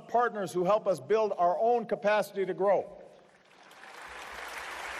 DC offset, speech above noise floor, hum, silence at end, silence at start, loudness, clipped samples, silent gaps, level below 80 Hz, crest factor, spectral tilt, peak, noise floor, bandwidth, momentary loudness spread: under 0.1%; 30 dB; none; 0 s; 0 s; -29 LUFS; under 0.1%; none; -70 dBFS; 14 dB; -5 dB/octave; -16 dBFS; -58 dBFS; 13.5 kHz; 17 LU